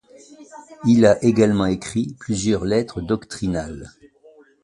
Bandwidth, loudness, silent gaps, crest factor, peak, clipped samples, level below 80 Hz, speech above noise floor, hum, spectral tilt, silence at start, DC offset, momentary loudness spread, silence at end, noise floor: 11.5 kHz; -20 LUFS; none; 20 dB; -2 dBFS; under 0.1%; -44 dBFS; 31 dB; none; -6 dB/octave; 0.4 s; under 0.1%; 11 LU; 0.75 s; -51 dBFS